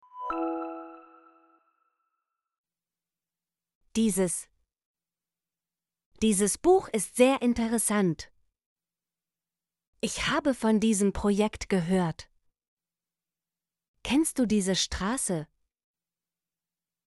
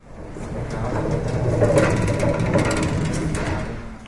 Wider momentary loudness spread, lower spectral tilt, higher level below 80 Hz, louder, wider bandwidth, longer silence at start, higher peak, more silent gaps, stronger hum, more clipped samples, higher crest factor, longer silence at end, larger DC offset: about the same, 12 LU vs 13 LU; second, -4.5 dB/octave vs -6.5 dB/octave; second, -52 dBFS vs -34 dBFS; second, -27 LUFS vs -22 LUFS; about the same, 12 kHz vs 11.5 kHz; about the same, 0.15 s vs 0.05 s; second, -8 dBFS vs -4 dBFS; first, 2.58-2.64 s, 3.75-3.81 s, 4.86-4.94 s, 6.06-6.11 s, 8.66-8.76 s, 9.87-9.93 s, 12.68-12.77 s, 13.88-13.94 s vs none; neither; neither; about the same, 22 dB vs 18 dB; first, 1.65 s vs 0 s; neither